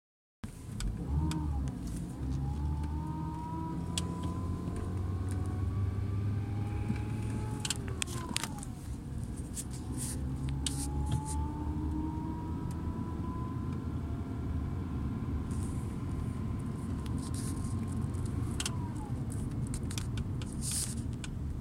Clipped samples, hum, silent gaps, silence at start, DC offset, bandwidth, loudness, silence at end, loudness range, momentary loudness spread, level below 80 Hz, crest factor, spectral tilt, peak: under 0.1%; none; none; 0.45 s; under 0.1%; 16 kHz; -37 LUFS; 0 s; 2 LU; 5 LU; -42 dBFS; 28 dB; -5.5 dB/octave; -8 dBFS